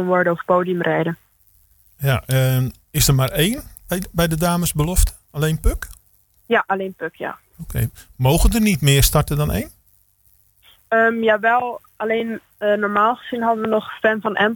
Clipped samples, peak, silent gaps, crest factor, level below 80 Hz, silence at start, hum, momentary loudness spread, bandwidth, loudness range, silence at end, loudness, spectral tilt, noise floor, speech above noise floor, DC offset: under 0.1%; -2 dBFS; none; 18 dB; -30 dBFS; 0 s; none; 12 LU; 19 kHz; 3 LU; 0 s; -19 LUFS; -5 dB/octave; -58 dBFS; 39 dB; under 0.1%